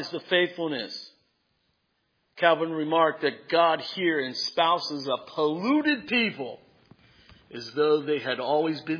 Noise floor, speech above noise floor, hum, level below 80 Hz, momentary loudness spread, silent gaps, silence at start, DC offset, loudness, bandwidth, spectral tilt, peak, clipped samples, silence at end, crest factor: -74 dBFS; 48 dB; none; -74 dBFS; 10 LU; none; 0 s; under 0.1%; -25 LUFS; 5.4 kHz; -5 dB/octave; -6 dBFS; under 0.1%; 0 s; 22 dB